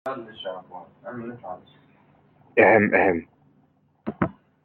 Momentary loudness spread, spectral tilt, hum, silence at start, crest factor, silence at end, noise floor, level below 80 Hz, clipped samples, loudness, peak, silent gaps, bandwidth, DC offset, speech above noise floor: 23 LU; -8.5 dB/octave; none; 0.05 s; 22 dB; 0.3 s; -63 dBFS; -62 dBFS; under 0.1%; -21 LUFS; -4 dBFS; none; 4.4 kHz; under 0.1%; 40 dB